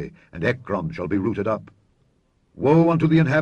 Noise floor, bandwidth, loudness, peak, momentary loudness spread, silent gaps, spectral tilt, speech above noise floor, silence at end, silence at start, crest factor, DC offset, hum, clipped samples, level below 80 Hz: -64 dBFS; 6.8 kHz; -21 LUFS; -6 dBFS; 10 LU; none; -9 dB/octave; 43 dB; 0 s; 0 s; 16 dB; under 0.1%; none; under 0.1%; -52 dBFS